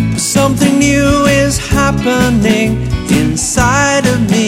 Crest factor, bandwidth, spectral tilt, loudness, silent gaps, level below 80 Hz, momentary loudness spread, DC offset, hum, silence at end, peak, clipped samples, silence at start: 10 dB; 16.5 kHz; -4.5 dB/octave; -11 LUFS; none; -26 dBFS; 3 LU; under 0.1%; none; 0 s; 0 dBFS; under 0.1%; 0 s